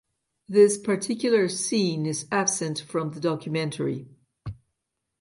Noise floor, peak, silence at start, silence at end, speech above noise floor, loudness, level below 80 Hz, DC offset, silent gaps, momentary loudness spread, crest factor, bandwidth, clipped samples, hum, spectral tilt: -81 dBFS; -6 dBFS; 0.5 s; 0.65 s; 57 dB; -25 LUFS; -60 dBFS; under 0.1%; none; 16 LU; 20 dB; 11.5 kHz; under 0.1%; none; -4.5 dB/octave